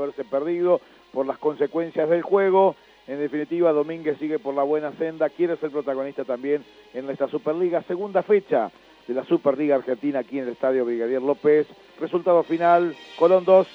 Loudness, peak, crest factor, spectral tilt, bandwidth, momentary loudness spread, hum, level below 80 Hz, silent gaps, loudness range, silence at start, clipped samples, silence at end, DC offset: -23 LUFS; -4 dBFS; 18 dB; -8 dB/octave; 6.4 kHz; 10 LU; none; -72 dBFS; none; 4 LU; 0 s; under 0.1%; 0 s; under 0.1%